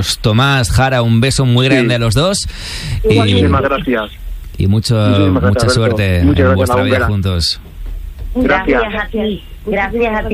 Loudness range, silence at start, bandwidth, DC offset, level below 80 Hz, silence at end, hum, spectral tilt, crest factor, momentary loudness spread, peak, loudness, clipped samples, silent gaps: 3 LU; 0 s; 15.5 kHz; under 0.1%; -26 dBFS; 0 s; none; -5.5 dB/octave; 12 dB; 12 LU; 0 dBFS; -13 LUFS; under 0.1%; none